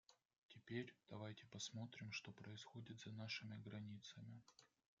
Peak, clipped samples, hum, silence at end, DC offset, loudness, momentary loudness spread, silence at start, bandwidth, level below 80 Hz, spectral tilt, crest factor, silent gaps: -36 dBFS; under 0.1%; none; 0.35 s; under 0.1%; -54 LUFS; 10 LU; 0.1 s; 7.4 kHz; -88 dBFS; -4 dB/octave; 20 dB; 0.38-0.49 s